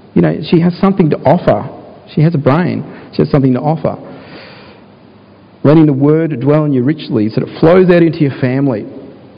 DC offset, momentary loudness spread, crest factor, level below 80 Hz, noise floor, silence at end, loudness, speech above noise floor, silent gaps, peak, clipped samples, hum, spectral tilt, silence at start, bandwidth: under 0.1%; 14 LU; 12 dB; -44 dBFS; -40 dBFS; 0.25 s; -12 LUFS; 30 dB; none; 0 dBFS; 0.5%; none; -11 dB/octave; 0.15 s; 5.2 kHz